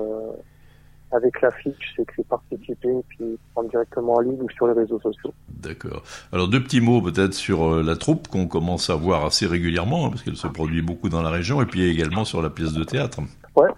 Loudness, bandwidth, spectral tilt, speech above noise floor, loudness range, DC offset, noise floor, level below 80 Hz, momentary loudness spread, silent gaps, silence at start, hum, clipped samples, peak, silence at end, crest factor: -23 LUFS; 12.5 kHz; -6 dB/octave; 27 dB; 4 LU; under 0.1%; -50 dBFS; -42 dBFS; 13 LU; none; 0 s; none; under 0.1%; -2 dBFS; 0 s; 20 dB